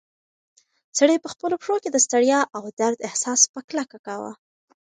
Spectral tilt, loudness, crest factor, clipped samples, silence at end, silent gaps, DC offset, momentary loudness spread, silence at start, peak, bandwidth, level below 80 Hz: -1.5 dB/octave; -21 LUFS; 22 dB; under 0.1%; 0.55 s; 2.73-2.77 s, 3.49-3.54 s, 3.64-3.68 s, 3.99-4.04 s; under 0.1%; 15 LU; 0.95 s; -2 dBFS; 10 kHz; -74 dBFS